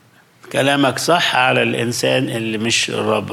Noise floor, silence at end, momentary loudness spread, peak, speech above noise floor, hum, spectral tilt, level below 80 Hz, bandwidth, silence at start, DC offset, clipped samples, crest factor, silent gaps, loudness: -46 dBFS; 0 s; 6 LU; -2 dBFS; 29 dB; none; -3.5 dB/octave; -62 dBFS; 16.5 kHz; 0.45 s; under 0.1%; under 0.1%; 14 dB; none; -16 LUFS